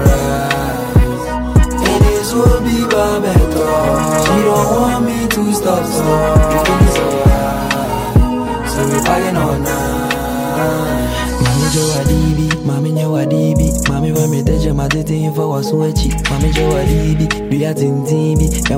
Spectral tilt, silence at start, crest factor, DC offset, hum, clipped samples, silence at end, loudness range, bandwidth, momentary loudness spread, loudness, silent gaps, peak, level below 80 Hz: -5.5 dB/octave; 0 s; 12 dB; under 0.1%; none; under 0.1%; 0 s; 2 LU; 16.5 kHz; 5 LU; -14 LUFS; none; 0 dBFS; -20 dBFS